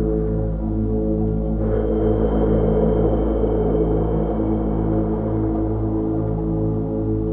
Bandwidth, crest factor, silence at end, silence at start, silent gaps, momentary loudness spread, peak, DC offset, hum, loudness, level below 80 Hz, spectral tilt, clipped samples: 3.4 kHz; 14 dB; 0 s; 0 s; none; 4 LU; -6 dBFS; 0.3%; none; -21 LUFS; -26 dBFS; -13.5 dB/octave; under 0.1%